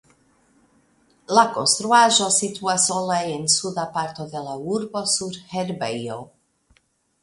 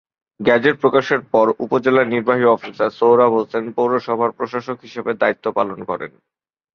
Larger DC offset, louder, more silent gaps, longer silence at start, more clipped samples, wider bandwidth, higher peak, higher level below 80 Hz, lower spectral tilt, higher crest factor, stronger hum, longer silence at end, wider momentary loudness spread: neither; about the same, -20 LUFS vs -18 LUFS; neither; first, 1.3 s vs 0.4 s; neither; first, 11.5 kHz vs 6.6 kHz; about the same, -2 dBFS vs -2 dBFS; about the same, -66 dBFS vs -62 dBFS; second, -2 dB/octave vs -7 dB/octave; first, 22 dB vs 16 dB; neither; first, 0.95 s vs 0.65 s; about the same, 14 LU vs 12 LU